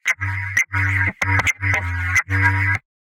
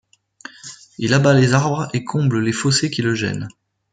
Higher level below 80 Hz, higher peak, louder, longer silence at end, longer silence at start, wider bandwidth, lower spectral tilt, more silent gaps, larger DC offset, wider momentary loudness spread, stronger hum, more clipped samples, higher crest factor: first, -42 dBFS vs -56 dBFS; about the same, -4 dBFS vs -2 dBFS; about the same, -19 LUFS vs -18 LUFS; second, 0.25 s vs 0.45 s; second, 0.05 s vs 0.65 s; first, 16.5 kHz vs 9.4 kHz; about the same, -4 dB/octave vs -5 dB/octave; neither; neither; second, 4 LU vs 22 LU; neither; neither; about the same, 16 dB vs 18 dB